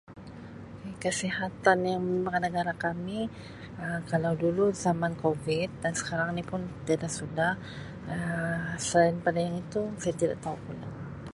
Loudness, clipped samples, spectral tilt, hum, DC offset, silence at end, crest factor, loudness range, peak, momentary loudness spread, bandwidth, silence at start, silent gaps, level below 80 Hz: -30 LUFS; under 0.1%; -5 dB/octave; none; under 0.1%; 0 s; 22 dB; 2 LU; -8 dBFS; 15 LU; 11.5 kHz; 0.1 s; none; -56 dBFS